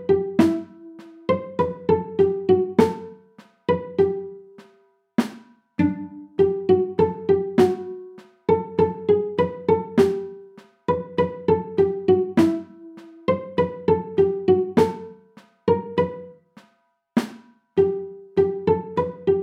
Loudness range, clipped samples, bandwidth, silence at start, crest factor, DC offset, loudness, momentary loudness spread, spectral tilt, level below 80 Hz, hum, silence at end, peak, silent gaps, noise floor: 4 LU; under 0.1%; 11.5 kHz; 0 s; 20 dB; under 0.1%; -22 LUFS; 15 LU; -8 dB/octave; -54 dBFS; none; 0 s; -2 dBFS; none; -65 dBFS